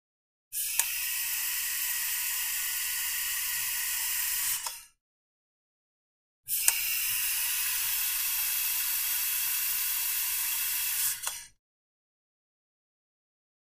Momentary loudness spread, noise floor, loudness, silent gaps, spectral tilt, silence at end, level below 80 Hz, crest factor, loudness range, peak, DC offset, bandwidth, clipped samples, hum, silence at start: 3 LU; under -90 dBFS; -28 LUFS; 5.01-6.44 s; 4 dB/octave; 2.15 s; -66 dBFS; 30 dB; 4 LU; -2 dBFS; under 0.1%; 15.5 kHz; under 0.1%; none; 0.5 s